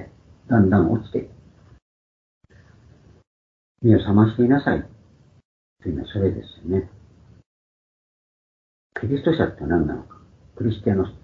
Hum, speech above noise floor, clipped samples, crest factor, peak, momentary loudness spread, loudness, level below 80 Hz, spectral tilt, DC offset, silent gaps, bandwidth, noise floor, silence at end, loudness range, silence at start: none; 33 dB; under 0.1%; 22 dB; -2 dBFS; 16 LU; -21 LUFS; -46 dBFS; -10 dB/octave; under 0.1%; 1.82-2.41 s, 3.27-3.75 s, 5.45-5.76 s, 7.46-8.90 s; 4.6 kHz; -53 dBFS; 0.05 s; 8 LU; 0 s